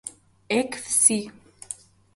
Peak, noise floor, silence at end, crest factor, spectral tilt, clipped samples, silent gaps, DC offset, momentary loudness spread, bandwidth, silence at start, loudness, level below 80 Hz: -2 dBFS; -42 dBFS; 0.4 s; 24 dB; -2 dB/octave; under 0.1%; none; under 0.1%; 21 LU; 12 kHz; 0.05 s; -21 LUFS; -66 dBFS